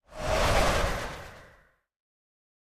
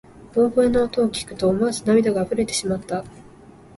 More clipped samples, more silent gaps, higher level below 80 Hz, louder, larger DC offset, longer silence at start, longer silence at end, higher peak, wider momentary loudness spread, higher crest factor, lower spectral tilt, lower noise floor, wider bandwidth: neither; neither; first, -36 dBFS vs -48 dBFS; second, -27 LUFS vs -21 LUFS; neither; about the same, 0.1 s vs 0.2 s; first, 1.25 s vs 0.6 s; second, -12 dBFS vs -6 dBFS; first, 18 LU vs 8 LU; about the same, 18 dB vs 16 dB; about the same, -4 dB/octave vs -5 dB/octave; first, -61 dBFS vs -46 dBFS; first, 14.5 kHz vs 11.5 kHz